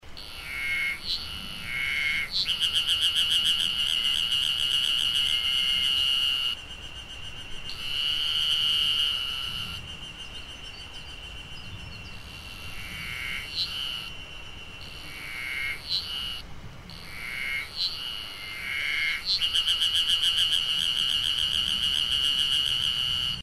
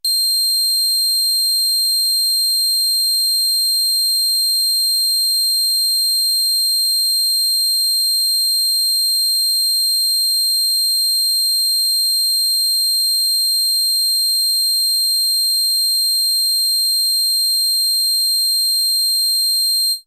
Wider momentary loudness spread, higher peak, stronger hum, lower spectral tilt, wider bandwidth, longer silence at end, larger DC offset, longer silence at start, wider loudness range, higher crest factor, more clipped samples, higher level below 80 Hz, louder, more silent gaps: first, 18 LU vs 0 LU; about the same, -12 dBFS vs -10 dBFS; neither; first, 0 dB/octave vs 6 dB/octave; about the same, 15.5 kHz vs 16 kHz; about the same, 0 s vs 0.05 s; neither; about the same, 0.05 s vs 0.05 s; first, 11 LU vs 0 LU; first, 18 dB vs 6 dB; neither; first, -48 dBFS vs -80 dBFS; second, -24 LUFS vs -13 LUFS; neither